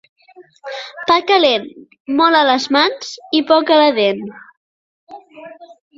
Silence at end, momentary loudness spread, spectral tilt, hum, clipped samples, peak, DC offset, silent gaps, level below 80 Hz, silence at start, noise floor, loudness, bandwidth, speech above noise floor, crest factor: 0.3 s; 21 LU; -3.5 dB/octave; none; under 0.1%; 0 dBFS; under 0.1%; 2.00-2.05 s, 4.57-5.07 s; -64 dBFS; 0.4 s; -38 dBFS; -14 LUFS; 7.8 kHz; 22 dB; 16 dB